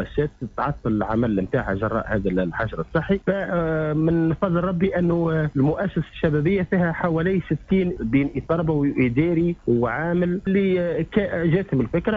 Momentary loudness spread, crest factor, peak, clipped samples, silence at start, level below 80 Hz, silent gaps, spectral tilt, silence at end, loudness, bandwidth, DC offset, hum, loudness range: 4 LU; 14 dB; -8 dBFS; under 0.1%; 0 s; -42 dBFS; none; -10 dB/octave; 0 s; -22 LUFS; 4.7 kHz; under 0.1%; none; 2 LU